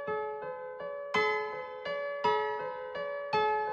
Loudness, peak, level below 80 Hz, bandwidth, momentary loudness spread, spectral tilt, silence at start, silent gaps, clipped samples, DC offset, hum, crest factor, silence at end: -33 LUFS; -16 dBFS; -72 dBFS; 8 kHz; 11 LU; -4 dB/octave; 0 s; none; under 0.1%; under 0.1%; none; 16 dB; 0 s